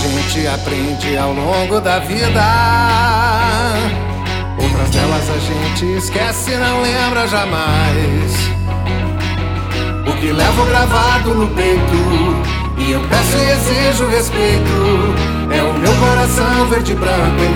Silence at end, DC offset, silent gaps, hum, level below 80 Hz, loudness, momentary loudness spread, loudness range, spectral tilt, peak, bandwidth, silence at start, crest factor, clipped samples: 0 s; under 0.1%; none; none; -22 dBFS; -14 LUFS; 6 LU; 3 LU; -5 dB/octave; 0 dBFS; 18 kHz; 0 s; 14 dB; under 0.1%